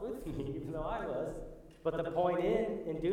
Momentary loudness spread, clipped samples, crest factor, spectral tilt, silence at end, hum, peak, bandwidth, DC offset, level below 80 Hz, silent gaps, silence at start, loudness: 9 LU; under 0.1%; 16 dB; -7.5 dB/octave; 0 s; none; -20 dBFS; 16.5 kHz; under 0.1%; -52 dBFS; none; 0 s; -36 LUFS